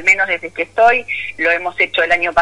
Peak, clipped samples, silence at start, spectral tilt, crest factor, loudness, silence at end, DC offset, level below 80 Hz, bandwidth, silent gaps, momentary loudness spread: -2 dBFS; under 0.1%; 0 s; -2.5 dB/octave; 14 dB; -15 LUFS; 0 s; under 0.1%; -50 dBFS; 11 kHz; none; 7 LU